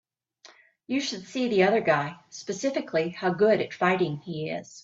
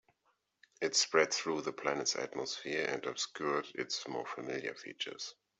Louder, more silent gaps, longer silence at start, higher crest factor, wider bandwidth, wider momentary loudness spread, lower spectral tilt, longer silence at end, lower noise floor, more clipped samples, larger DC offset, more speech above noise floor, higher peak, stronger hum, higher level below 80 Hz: first, -26 LUFS vs -35 LUFS; neither; second, 0.45 s vs 0.8 s; second, 18 dB vs 24 dB; about the same, 7.8 kHz vs 8.2 kHz; about the same, 12 LU vs 11 LU; first, -5 dB/octave vs -1.5 dB/octave; second, 0.05 s vs 0.3 s; second, -56 dBFS vs -79 dBFS; neither; neither; second, 30 dB vs 42 dB; about the same, -10 dBFS vs -12 dBFS; neither; first, -70 dBFS vs -82 dBFS